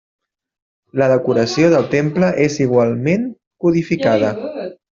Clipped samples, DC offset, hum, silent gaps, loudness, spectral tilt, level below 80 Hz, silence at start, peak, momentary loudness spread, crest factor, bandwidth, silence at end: under 0.1%; under 0.1%; none; 3.47-3.51 s; -16 LUFS; -6.5 dB/octave; -54 dBFS; 0.95 s; -2 dBFS; 12 LU; 14 dB; 7.6 kHz; 0.2 s